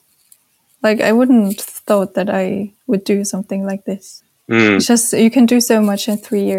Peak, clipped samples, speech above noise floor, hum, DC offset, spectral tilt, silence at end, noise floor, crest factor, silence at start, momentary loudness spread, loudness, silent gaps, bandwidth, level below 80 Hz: 0 dBFS; under 0.1%; 41 dB; none; under 0.1%; -4.5 dB/octave; 0 s; -55 dBFS; 14 dB; 0.85 s; 11 LU; -15 LUFS; none; 16.5 kHz; -64 dBFS